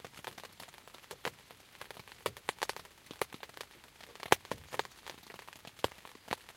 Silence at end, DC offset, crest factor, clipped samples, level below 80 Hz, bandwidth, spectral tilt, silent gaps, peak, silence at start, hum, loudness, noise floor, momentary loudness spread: 0 s; under 0.1%; 40 dB; under 0.1%; -68 dBFS; 17 kHz; -2.5 dB/octave; none; -2 dBFS; 0 s; none; -40 LUFS; -58 dBFS; 20 LU